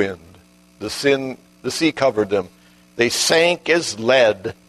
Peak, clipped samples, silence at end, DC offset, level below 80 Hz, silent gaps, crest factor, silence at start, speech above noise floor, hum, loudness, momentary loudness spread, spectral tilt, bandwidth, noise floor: -2 dBFS; under 0.1%; 0.15 s; under 0.1%; -58 dBFS; none; 18 dB; 0 s; 31 dB; none; -18 LUFS; 16 LU; -3 dB/octave; 13.5 kHz; -49 dBFS